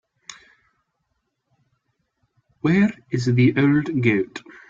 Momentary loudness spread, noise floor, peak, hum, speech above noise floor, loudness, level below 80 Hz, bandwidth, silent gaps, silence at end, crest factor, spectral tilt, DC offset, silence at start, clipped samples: 23 LU; -74 dBFS; -4 dBFS; none; 55 dB; -20 LUFS; -58 dBFS; 7.8 kHz; none; 0.3 s; 18 dB; -7.5 dB/octave; under 0.1%; 0.3 s; under 0.1%